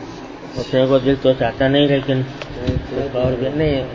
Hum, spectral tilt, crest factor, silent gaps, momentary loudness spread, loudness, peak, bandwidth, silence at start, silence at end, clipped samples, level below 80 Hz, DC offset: none; -7.5 dB/octave; 16 dB; none; 13 LU; -18 LUFS; -2 dBFS; 7.6 kHz; 0 s; 0 s; under 0.1%; -36 dBFS; under 0.1%